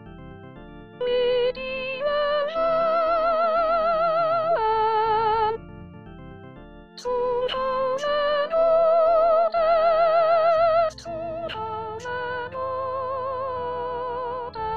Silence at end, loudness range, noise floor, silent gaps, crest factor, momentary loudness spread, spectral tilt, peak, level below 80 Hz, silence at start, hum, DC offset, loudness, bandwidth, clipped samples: 0 s; 7 LU; -44 dBFS; none; 14 dB; 23 LU; -5 dB/octave; -10 dBFS; -50 dBFS; 0 s; none; 0.4%; -23 LUFS; 7.4 kHz; under 0.1%